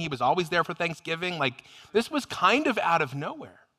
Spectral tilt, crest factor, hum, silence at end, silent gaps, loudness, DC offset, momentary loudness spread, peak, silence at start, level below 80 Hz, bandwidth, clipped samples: -4.5 dB/octave; 20 dB; none; 0.3 s; none; -26 LUFS; under 0.1%; 8 LU; -8 dBFS; 0 s; -66 dBFS; 15.5 kHz; under 0.1%